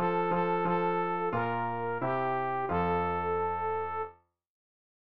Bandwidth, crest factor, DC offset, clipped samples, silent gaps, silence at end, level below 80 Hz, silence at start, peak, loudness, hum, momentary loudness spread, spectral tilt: 5.2 kHz; 14 dB; 0.3%; under 0.1%; none; 0.5 s; -60 dBFS; 0 s; -18 dBFS; -31 LUFS; none; 4 LU; -5.5 dB/octave